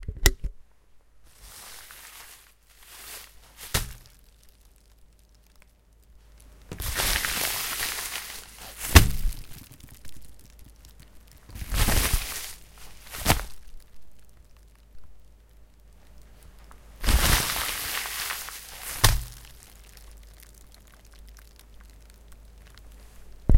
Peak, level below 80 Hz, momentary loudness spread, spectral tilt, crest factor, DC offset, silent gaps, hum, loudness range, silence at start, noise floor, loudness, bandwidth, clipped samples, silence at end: 0 dBFS; -32 dBFS; 26 LU; -3 dB/octave; 30 dB; under 0.1%; none; none; 13 LU; 0 s; -57 dBFS; -26 LUFS; 17 kHz; under 0.1%; 0 s